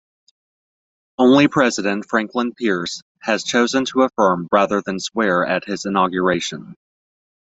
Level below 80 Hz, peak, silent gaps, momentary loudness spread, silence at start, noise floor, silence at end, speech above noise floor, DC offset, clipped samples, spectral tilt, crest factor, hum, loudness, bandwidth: -60 dBFS; -2 dBFS; 3.02-3.15 s; 9 LU; 1.2 s; under -90 dBFS; 0.8 s; over 72 dB; under 0.1%; under 0.1%; -4.5 dB/octave; 18 dB; none; -18 LUFS; 8.2 kHz